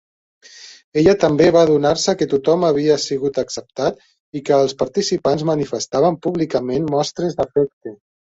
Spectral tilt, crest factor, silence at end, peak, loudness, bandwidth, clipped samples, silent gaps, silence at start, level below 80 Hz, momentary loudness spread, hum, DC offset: -5.5 dB/octave; 18 dB; 0.35 s; 0 dBFS; -18 LUFS; 8 kHz; under 0.1%; 0.84-0.92 s, 4.20-4.32 s, 7.73-7.81 s; 0.55 s; -50 dBFS; 10 LU; none; under 0.1%